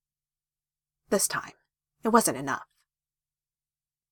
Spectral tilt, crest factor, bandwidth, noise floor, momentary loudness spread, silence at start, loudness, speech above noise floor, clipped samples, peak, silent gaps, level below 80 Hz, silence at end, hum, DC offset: -3 dB/octave; 28 dB; 17.5 kHz; under -90 dBFS; 12 LU; 1.1 s; -27 LUFS; over 64 dB; under 0.1%; -4 dBFS; none; -68 dBFS; 1.5 s; none; under 0.1%